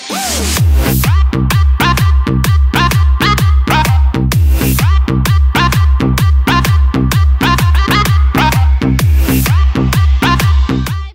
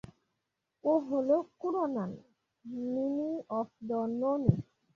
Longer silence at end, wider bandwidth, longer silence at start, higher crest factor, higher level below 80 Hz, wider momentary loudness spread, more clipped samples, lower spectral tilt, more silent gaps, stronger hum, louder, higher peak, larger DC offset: second, 0.05 s vs 0.35 s; first, 16.5 kHz vs 7 kHz; second, 0 s vs 0.85 s; second, 8 dB vs 22 dB; first, -12 dBFS vs -58 dBFS; second, 2 LU vs 9 LU; neither; second, -5 dB/octave vs -11 dB/octave; neither; neither; first, -11 LUFS vs -33 LUFS; first, 0 dBFS vs -10 dBFS; neither